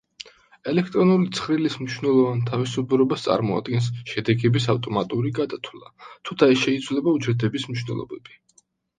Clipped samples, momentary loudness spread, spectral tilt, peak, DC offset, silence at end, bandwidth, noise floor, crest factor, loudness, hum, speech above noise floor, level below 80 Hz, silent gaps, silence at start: under 0.1%; 15 LU; -6.5 dB/octave; -2 dBFS; under 0.1%; 0.8 s; 9.6 kHz; -62 dBFS; 20 dB; -22 LUFS; none; 39 dB; -60 dBFS; none; 0.2 s